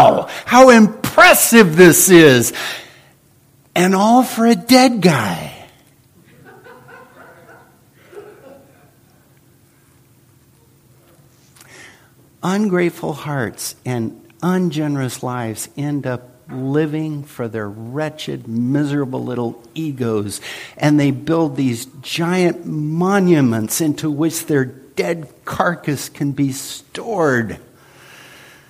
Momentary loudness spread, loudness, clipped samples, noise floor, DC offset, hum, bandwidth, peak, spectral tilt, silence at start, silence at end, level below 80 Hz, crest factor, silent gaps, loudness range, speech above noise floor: 18 LU; -15 LUFS; under 0.1%; -52 dBFS; under 0.1%; none; 15.5 kHz; 0 dBFS; -4.5 dB/octave; 0 s; 1.15 s; -56 dBFS; 16 dB; none; 12 LU; 37 dB